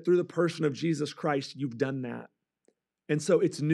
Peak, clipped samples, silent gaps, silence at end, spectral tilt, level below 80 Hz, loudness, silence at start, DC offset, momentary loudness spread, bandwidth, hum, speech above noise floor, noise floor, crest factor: -12 dBFS; under 0.1%; none; 0 s; -6.5 dB/octave; -86 dBFS; -30 LUFS; 0 s; under 0.1%; 10 LU; 12 kHz; none; 44 dB; -73 dBFS; 18 dB